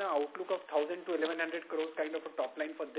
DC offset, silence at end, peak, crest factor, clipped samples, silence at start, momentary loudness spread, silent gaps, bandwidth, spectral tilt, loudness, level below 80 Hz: under 0.1%; 0 s; -20 dBFS; 16 dB; under 0.1%; 0 s; 4 LU; none; 4 kHz; -0.5 dB/octave; -36 LUFS; under -90 dBFS